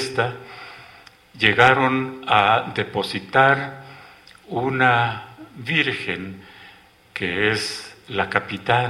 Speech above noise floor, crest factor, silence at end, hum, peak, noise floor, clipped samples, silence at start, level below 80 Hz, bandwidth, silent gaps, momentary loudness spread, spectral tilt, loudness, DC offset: 29 dB; 22 dB; 0 s; none; 0 dBFS; -49 dBFS; under 0.1%; 0 s; -56 dBFS; 15.5 kHz; none; 20 LU; -5 dB/octave; -20 LUFS; under 0.1%